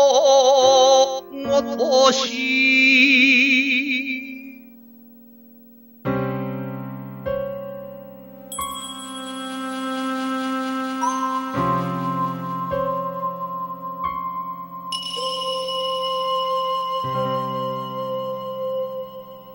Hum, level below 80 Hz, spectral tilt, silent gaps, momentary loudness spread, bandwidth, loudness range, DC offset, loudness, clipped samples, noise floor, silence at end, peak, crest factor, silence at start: none; -56 dBFS; -3.5 dB/octave; none; 18 LU; 16.5 kHz; 14 LU; under 0.1%; -20 LUFS; under 0.1%; -47 dBFS; 0 s; -4 dBFS; 18 dB; 0 s